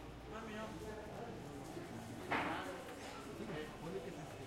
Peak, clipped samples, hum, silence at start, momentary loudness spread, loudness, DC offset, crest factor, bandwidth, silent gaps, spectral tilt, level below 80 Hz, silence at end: -26 dBFS; under 0.1%; none; 0 s; 9 LU; -46 LUFS; under 0.1%; 20 dB; 16.5 kHz; none; -5 dB/octave; -62 dBFS; 0 s